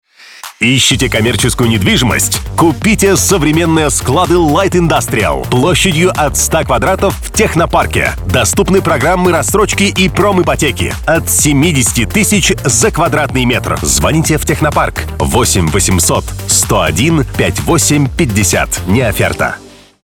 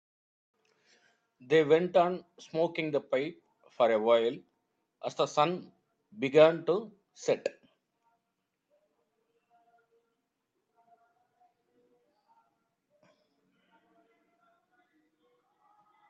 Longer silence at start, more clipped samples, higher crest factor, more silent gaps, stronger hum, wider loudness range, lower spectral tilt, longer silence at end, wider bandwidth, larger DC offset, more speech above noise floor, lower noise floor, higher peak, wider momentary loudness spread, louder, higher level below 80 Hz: second, 0.2 s vs 1.5 s; neither; second, 10 dB vs 24 dB; neither; neither; second, 1 LU vs 10 LU; second, -4 dB/octave vs -5.5 dB/octave; second, 0.35 s vs 8.6 s; first, 20 kHz vs 8 kHz; first, 0.1% vs under 0.1%; second, 21 dB vs 55 dB; second, -32 dBFS vs -83 dBFS; first, 0 dBFS vs -10 dBFS; second, 4 LU vs 17 LU; first, -10 LUFS vs -29 LUFS; first, -24 dBFS vs -82 dBFS